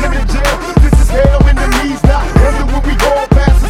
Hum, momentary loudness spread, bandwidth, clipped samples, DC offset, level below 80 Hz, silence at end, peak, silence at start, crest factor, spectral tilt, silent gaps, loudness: none; 5 LU; 15 kHz; 0.4%; 0.7%; -10 dBFS; 0 s; 0 dBFS; 0 s; 8 dB; -6 dB/octave; none; -11 LUFS